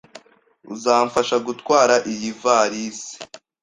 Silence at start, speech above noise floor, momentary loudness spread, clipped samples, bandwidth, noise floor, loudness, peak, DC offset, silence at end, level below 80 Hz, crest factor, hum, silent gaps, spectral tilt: 0.15 s; 34 dB; 18 LU; under 0.1%; 11 kHz; -53 dBFS; -19 LUFS; -2 dBFS; under 0.1%; 0.25 s; -64 dBFS; 18 dB; none; none; -3 dB/octave